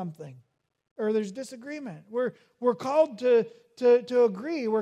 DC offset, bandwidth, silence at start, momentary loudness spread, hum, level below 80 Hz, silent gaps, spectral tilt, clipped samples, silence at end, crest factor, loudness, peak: under 0.1%; 10 kHz; 0 s; 16 LU; none; -82 dBFS; 0.91-0.96 s; -6 dB/octave; under 0.1%; 0 s; 16 dB; -26 LUFS; -12 dBFS